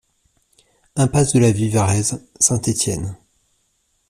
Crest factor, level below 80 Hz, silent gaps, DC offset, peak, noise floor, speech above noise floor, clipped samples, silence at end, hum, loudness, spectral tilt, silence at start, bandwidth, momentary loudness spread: 20 dB; -46 dBFS; none; under 0.1%; 0 dBFS; -66 dBFS; 49 dB; under 0.1%; 0.95 s; none; -18 LUFS; -5 dB/octave; 0.95 s; 14.5 kHz; 10 LU